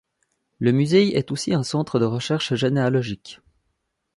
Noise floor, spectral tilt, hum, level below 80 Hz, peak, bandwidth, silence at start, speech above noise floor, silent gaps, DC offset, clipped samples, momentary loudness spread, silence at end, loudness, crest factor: -74 dBFS; -6 dB/octave; none; -58 dBFS; -4 dBFS; 11.5 kHz; 0.6 s; 54 dB; none; under 0.1%; under 0.1%; 8 LU; 0.85 s; -21 LUFS; 18 dB